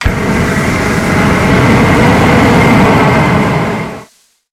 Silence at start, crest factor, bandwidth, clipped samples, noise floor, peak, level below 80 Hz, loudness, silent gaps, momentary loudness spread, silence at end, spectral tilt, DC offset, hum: 0 s; 8 dB; 16 kHz; under 0.1%; -43 dBFS; 0 dBFS; -24 dBFS; -9 LUFS; none; 7 LU; 0.5 s; -6 dB/octave; under 0.1%; none